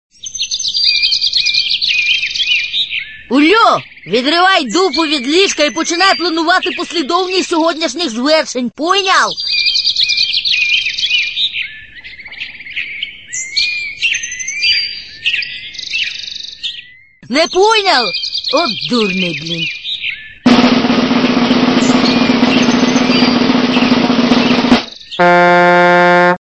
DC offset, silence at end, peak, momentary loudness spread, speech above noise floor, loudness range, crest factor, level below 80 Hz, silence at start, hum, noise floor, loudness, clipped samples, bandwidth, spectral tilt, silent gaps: 0.3%; 0.25 s; 0 dBFS; 12 LU; 27 dB; 5 LU; 14 dB; -46 dBFS; 0.25 s; none; -39 dBFS; -12 LUFS; under 0.1%; 8.8 kHz; -3 dB/octave; none